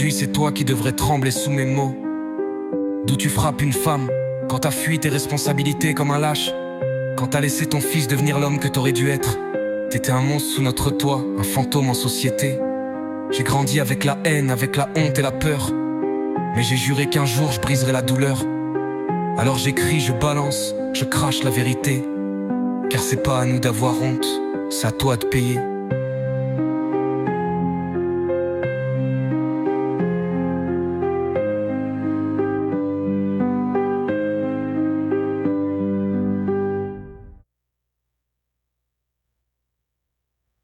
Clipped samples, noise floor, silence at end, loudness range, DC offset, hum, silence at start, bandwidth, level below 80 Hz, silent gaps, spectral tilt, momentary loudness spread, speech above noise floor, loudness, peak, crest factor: under 0.1%; -79 dBFS; 3.25 s; 2 LU; under 0.1%; none; 0 s; 16.5 kHz; -48 dBFS; none; -5 dB/octave; 5 LU; 60 dB; -21 LUFS; -6 dBFS; 16 dB